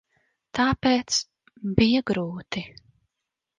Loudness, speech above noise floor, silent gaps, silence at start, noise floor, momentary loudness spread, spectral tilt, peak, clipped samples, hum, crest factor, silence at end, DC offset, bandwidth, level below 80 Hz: -24 LUFS; 61 dB; none; 0.55 s; -84 dBFS; 14 LU; -4.5 dB/octave; -4 dBFS; under 0.1%; none; 22 dB; 0.9 s; under 0.1%; 10 kHz; -48 dBFS